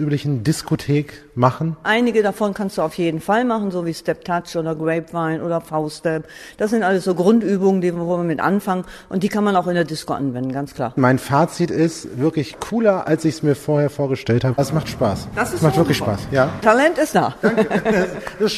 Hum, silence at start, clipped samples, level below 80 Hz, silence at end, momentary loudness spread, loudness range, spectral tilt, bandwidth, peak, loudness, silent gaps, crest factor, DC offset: none; 0 s; under 0.1%; -48 dBFS; 0 s; 8 LU; 4 LU; -6.5 dB/octave; 13.5 kHz; 0 dBFS; -19 LUFS; none; 18 dB; under 0.1%